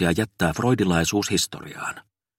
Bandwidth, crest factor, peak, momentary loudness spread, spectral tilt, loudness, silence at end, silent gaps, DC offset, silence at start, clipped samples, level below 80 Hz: 16.5 kHz; 18 dB; -6 dBFS; 12 LU; -4.5 dB/octave; -23 LUFS; 0.4 s; none; under 0.1%; 0 s; under 0.1%; -46 dBFS